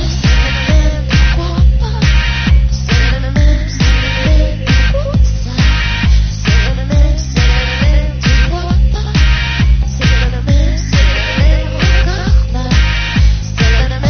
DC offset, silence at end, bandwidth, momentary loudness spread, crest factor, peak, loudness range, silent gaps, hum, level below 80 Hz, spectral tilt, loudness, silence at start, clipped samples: under 0.1%; 0 s; 6.6 kHz; 2 LU; 10 dB; 0 dBFS; 1 LU; none; none; -12 dBFS; -5.5 dB/octave; -13 LUFS; 0 s; under 0.1%